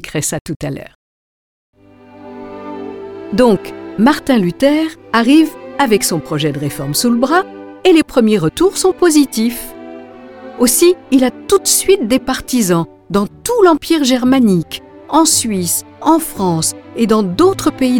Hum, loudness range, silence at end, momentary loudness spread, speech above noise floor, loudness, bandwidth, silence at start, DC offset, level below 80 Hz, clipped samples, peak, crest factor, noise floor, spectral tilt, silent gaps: none; 4 LU; 0 s; 17 LU; 28 dB; -13 LUFS; 19 kHz; 0.05 s; under 0.1%; -44 dBFS; under 0.1%; 0 dBFS; 14 dB; -40 dBFS; -4 dB/octave; 0.41-0.45 s, 0.56-0.60 s, 0.95-1.73 s